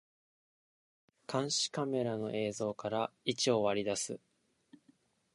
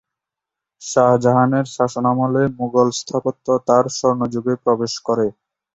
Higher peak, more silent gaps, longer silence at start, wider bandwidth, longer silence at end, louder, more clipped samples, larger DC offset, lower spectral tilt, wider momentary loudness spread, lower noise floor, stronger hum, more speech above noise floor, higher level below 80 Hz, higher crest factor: second, -16 dBFS vs -2 dBFS; neither; first, 1.3 s vs 0.8 s; first, 11.5 kHz vs 8 kHz; first, 1.15 s vs 0.45 s; second, -35 LUFS vs -18 LUFS; neither; neither; second, -3.5 dB/octave vs -6 dB/octave; about the same, 8 LU vs 7 LU; second, -70 dBFS vs -85 dBFS; neither; second, 36 dB vs 68 dB; second, -76 dBFS vs -58 dBFS; about the same, 20 dB vs 16 dB